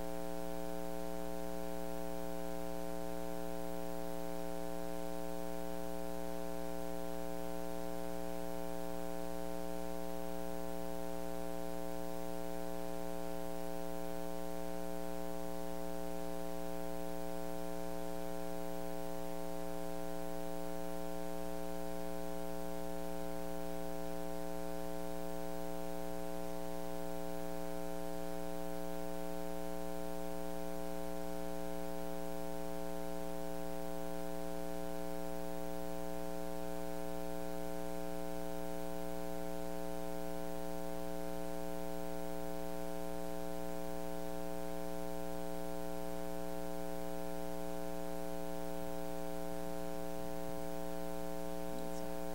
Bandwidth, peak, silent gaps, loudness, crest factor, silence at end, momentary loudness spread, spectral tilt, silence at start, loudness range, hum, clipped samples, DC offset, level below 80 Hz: 16 kHz; -28 dBFS; none; -44 LUFS; 12 dB; 0 s; 0 LU; -5.5 dB/octave; 0 s; 0 LU; none; under 0.1%; 1%; -56 dBFS